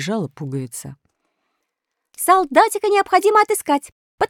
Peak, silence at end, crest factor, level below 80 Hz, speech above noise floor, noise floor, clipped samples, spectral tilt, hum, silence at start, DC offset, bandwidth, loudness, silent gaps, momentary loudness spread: -2 dBFS; 0.05 s; 18 dB; -60 dBFS; 61 dB; -79 dBFS; under 0.1%; -4 dB/octave; none; 0 s; under 0.1%; 17.5 kHz; -17 LUFS; 3.92-4.18 s; 15 LU